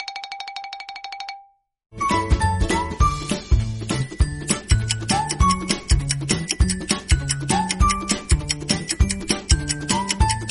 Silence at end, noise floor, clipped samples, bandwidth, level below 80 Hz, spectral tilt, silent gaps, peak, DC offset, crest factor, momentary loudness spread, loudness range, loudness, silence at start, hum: 0 s; -50 dBFS; under 0.1%; 11.5 kHz; -26 dBFS; -4 dB/octave; none; -2 dBFS; under 0.1%; 20 dB; 12 LU; 3 LU; -22 LUFS; 0 s; none